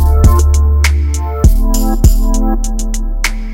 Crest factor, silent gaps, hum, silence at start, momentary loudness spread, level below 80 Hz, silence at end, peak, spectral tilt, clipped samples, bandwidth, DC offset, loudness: 10 dB; none; none; 0 s; 9 LU; -10 dBFS; 0 s; 0 dBFS; -5.5 dB/octave; 1%; 16.5 kHz; under 0.1%; -13 LUFS